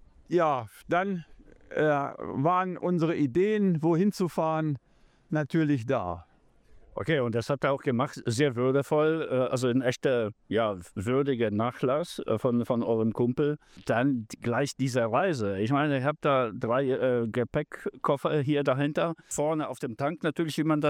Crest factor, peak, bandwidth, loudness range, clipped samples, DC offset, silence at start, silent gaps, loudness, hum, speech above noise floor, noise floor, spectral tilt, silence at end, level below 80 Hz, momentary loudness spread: 16 dB; -12 dBFS; 15.5 kHz; 2 LU; under 0.1%; under 0.1%; 0.3 s; none; -28 LUFS; none; 30 dB; -57 dBFS; -6.5 dB/octave; 0 s; -62 dBFS; 6 LU